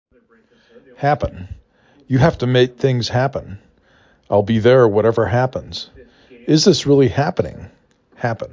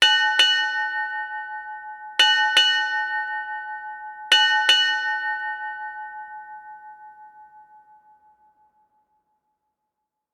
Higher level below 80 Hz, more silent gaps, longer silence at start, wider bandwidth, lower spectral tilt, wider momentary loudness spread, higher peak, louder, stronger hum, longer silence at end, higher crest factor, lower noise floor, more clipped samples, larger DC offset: first, -42 dBFS vs -78 dBFS; neither; first, 1 s vs 0 s; second, 7.6 kHz vs 18 kHz; first, -6 dB/octave vs 3.5 dB/octave; second, 17 LU vs 20 LU; about the same, -2 dBFS vs -4 dBFS; first, -16 LUFS vs -19 LUFS; neither; second, 0.05 s vs 2.7 s; about the same, 16 dB vs 20 dB; second, -54 dBFS vs -81 dBFS; neither; neither